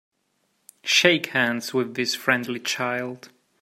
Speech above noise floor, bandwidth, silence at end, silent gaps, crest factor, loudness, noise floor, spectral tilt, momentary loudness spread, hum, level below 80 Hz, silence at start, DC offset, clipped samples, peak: 48 dB; 16 kHz; 0.35 s; none; 24 dB; -22 LUFS; -71 dBFS; -2.5 dB/octave; 14 LU; none; -72 dBFS; 0.85 s; under 0.1%; under 0.1%; 0 dBFS